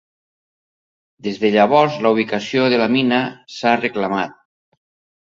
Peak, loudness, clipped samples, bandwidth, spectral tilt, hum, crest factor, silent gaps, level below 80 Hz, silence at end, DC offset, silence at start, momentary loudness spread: 0 dBFS; -17 LUFS; under 0.1%; 7.6 kHz; -6 dB/octave; none; 18 dB; none; -62 dBFS; 0.9 s; under 0.1%; 1.25 s; 12 LU